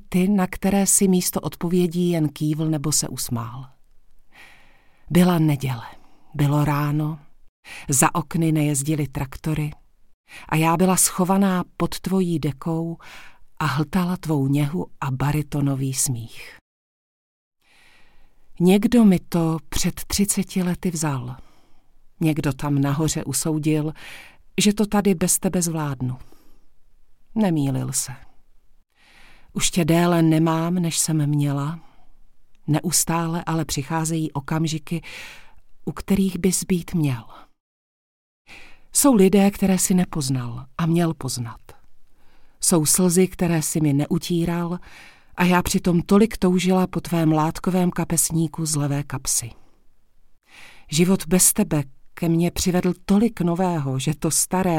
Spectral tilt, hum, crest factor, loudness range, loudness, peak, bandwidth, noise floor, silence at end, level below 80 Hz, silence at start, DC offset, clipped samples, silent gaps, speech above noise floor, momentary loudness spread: -5 dB/octave; none; 18 dB; 5 LU; -21 LUFS; -4 dBFS; 17 kHz; -52 dBFS; 0 s; -44 dBFS; 0.1 s; under 0.1%; under 0.1%; 7.49-7.63 s, 10.14-10.24 s, 16.61-17.51 s, 37.60-38.45 s; 31 dB; 13 LU